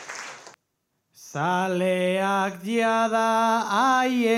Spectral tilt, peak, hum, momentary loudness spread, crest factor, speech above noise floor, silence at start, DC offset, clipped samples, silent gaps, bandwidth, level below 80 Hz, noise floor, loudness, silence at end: -4.5 dB/octave; -10 dBFS; none; 14 LU; 14 dB; 54 dB; 0 s; under 0.1%; under 0.1%; none; 16 kHz; -84 dBFS; -76 dBFS; -23 LUFS; 0 s